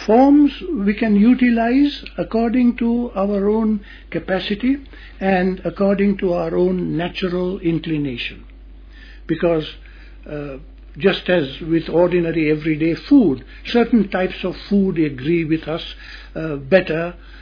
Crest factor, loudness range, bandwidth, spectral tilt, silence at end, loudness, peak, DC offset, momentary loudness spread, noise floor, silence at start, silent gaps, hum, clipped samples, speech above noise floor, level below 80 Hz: 18 dB; 6 LU; 5.4 kHz; -8.5 dB/octave; 0 s; -18 LUFS; 0 dBFS; under 0.1%; 13 LU; -39 dBFS; 0 s; none; none; under 0.1%; 21 dB; -40 dBFS